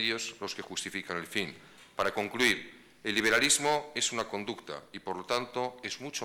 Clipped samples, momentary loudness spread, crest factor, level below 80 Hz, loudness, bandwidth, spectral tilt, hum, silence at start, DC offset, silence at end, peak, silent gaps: under 0.1%; 15 LU; 22 dB; -66 dBFS; -31 LUFS; 18 kHz; -1.5 dB/octave; none; 0 s; under 0.1%; 0 s; -10 dBFS; none